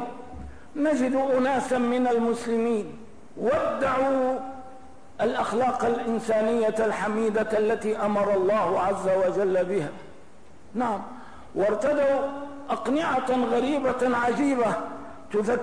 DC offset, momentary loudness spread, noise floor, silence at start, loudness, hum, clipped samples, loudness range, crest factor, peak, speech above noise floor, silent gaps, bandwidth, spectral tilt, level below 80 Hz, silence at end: 0.7%; 14 LU; -52 dBFS; 0 s; -25 LUFS; none; under 0.1%; 3 LU; 10 dB; -14 dBFS; 28 dB; none; 11 kHz; -5.5 dB/octave; -56 dBFS; 0 s